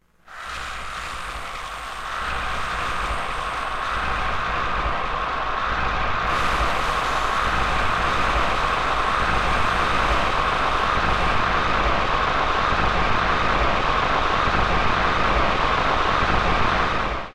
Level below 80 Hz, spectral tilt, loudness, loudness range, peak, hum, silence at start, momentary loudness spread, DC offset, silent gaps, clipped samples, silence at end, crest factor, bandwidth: -32 dBFS; -4.5 dB/octave; -22 LUFS; 6 LU; -10 dBFS; none; 0 s; 9 LU; 1%; none; under 0.1%; 0 s; 12 dB; 13.5 kHz